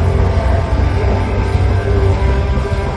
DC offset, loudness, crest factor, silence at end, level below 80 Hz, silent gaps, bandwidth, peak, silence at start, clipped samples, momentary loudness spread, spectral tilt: under 0.1%; -15 LUFS; 12 dB; 0 s; -16 dBFS; none; 9.4 kHz; -2 dBFS; 0 s; under 0.1%; 2 LU; -7.5 dB/octave